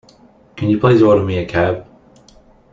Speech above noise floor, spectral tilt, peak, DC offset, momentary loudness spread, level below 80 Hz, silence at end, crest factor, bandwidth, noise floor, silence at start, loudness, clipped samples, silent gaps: 34 dB; -8.5 dB/octave; 0 dBFS; under 0.1%; 10 LU; -46 dBFS; 0.9 s; 16 dB; 7.4 kHz; -48 dBFS; 0.55 s; -15 LUFS; under 0.1%; none